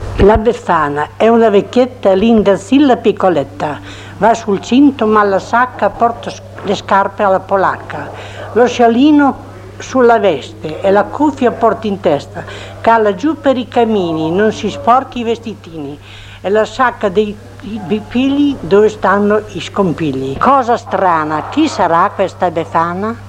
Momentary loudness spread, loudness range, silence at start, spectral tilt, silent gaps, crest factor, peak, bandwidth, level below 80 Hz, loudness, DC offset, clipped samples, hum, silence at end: 15 LU; 4 LU; 0 s; -6 dB/octave; none; 12 dB; 0 dBFS; 10.5 kHz; -34 dBFS; -12 LUFS; under 0.1%; under 0.1%; none; 0 s